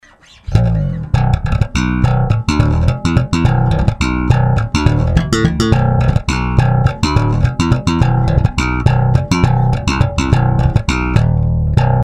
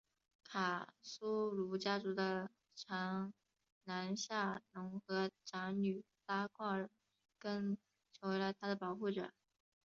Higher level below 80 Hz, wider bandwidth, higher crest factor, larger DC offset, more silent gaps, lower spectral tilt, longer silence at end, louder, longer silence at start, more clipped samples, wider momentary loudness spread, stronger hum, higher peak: first, -20 dBFS vs -84 dBFS; first, 10.5 kHz vs 7.6 kHz; second, 12 dB vs 20 dB; first, 0.3% vs under 0.1%; second, none vs 3.72-3.81 s; first, -6.5 dB/octave vs -4 dB/octave; second, 0 s vs 0.6 s; first, -14 LUFS vs -43 LUFS; about the same, 0.45 s vs 0.5 s; first, 0.3% vs under 0.1%; second, 3 LU vs 9 LU; neither; first, 0 dBFS vs -24 dBFS